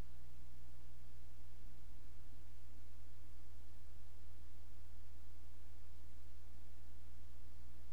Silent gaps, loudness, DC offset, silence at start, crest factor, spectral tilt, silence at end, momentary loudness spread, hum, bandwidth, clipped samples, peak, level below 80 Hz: none; -62 LUFS; 2%; 0 s; 12 dB; -5.5 dB/octave; 0 s; 1 LU; 60 Hz at -60 dBFS; over 20 kHz; under 0.1%; -32 dBFS; -58 dBFS